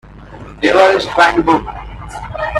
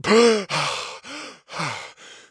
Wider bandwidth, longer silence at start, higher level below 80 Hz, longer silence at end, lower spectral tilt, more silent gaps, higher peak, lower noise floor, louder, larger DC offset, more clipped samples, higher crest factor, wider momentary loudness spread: first, 12.5 kHz vs 10.5 kHz; about the same, 0.1 s vs 0.05 s; first, -34 dBFS vs -64 dBFS; second, 0 s vs 0.15 s; first, -5 dB/octave vs -3.5 dB/octave; neither; first, 0 dBFS vs -4 dBFS; second, -33 dBFS vs -42 dBFS; first, -12 LUFS vs -22 LUFS; neither; neither; about the same, 14 dB vs 18 dB; about the same, 18 LU vs 19 LU